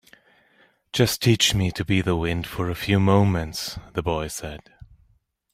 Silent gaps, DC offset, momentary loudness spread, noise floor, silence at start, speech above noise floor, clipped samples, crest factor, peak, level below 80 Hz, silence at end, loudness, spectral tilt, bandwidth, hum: none; under 0.1%; 12 LU; -64 dBFS; 0.95 s; 42 dB; under 0.1%; 20 dB; -4 dBFS; -44 dBFS; 0.95 s; -23 LUFS; -5 dB/octave; 16 kHz; none